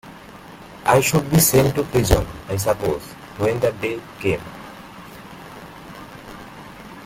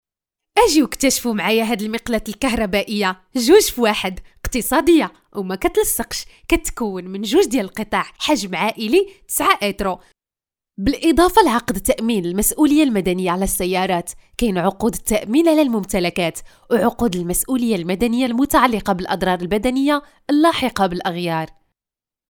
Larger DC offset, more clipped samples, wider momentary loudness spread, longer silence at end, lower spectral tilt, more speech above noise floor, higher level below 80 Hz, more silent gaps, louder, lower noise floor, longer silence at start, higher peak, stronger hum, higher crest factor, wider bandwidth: neither; neither; first, 23 LU vs 9 LU; second, 0 s vs 0.8 s; about the same, -5 dB/octave vs -4 dB/octave; second, 22 dB vs over 72 dB; about the same, -36 dBFS vs -38 dBFS; neither; about the same, -20 LUFS vs -18 LUFS; second, -40 dBFS vs under -90 dBFS; second, 0.05 s vs 0.55 s; about the same, -2 dBFS vs 0 dBFS; neither; about the same, 20 dB vs 18 dB; second, 16.5 kHz vs over 20 kHz